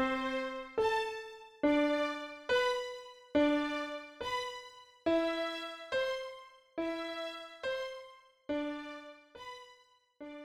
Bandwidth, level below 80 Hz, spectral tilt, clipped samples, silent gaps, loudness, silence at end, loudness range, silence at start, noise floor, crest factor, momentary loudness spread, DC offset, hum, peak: 13.5 kHz; -66 dBFS; -3.5 dB/octave; under 0.1%; none; -35 LUFS; 0 s; 8 LU; 0 s; -64 dBFS; 18 dB; 19 LU; under 0.1%; none; -18 dBFS